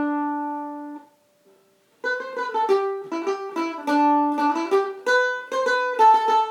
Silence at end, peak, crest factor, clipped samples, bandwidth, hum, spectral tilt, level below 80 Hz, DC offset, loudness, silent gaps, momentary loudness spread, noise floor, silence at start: 0 s; -8 dBFS; 16 dB; under 0.1%; 13.5 kHz; none; -2.5 dB/octave; -90 dBFS; under 0.1%; -22 LUFS; none; 14 LU; -60 dBFS; 0 s